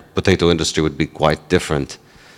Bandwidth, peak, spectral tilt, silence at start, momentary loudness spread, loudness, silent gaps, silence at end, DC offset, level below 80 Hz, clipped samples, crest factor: 15 kHz; 0 dBFS; -5 dB/octave; 0.15 s; 9 LU; -18 LUFS; none; 0.4 s; under 0.1%; -40 dBFS; under 0.1%; 18 dB